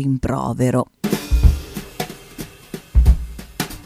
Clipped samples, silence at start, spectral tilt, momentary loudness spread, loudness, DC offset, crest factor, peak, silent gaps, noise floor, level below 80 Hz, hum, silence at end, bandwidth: under 0.1%; 0 s; -6.5 dB/octave; 17 LU; -20 LUFS; under 0.1%; 18 dB; 0 dBFS; none; -36 dBFS; -20 dBFS; none; 0.05 s; 15.5 kHz